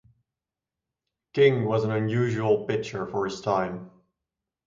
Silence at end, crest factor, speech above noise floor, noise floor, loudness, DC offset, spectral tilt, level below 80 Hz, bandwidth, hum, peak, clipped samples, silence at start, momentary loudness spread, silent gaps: 0.8 s; 20 dB; 64 dB; -89 dBFS; -25 LUFS; under 0.1%; -7 dB/octave; -62 dBFS; 7.6 kHz; none; -8 dBFS; under 0.1%; 1.35 s; 11 LU; none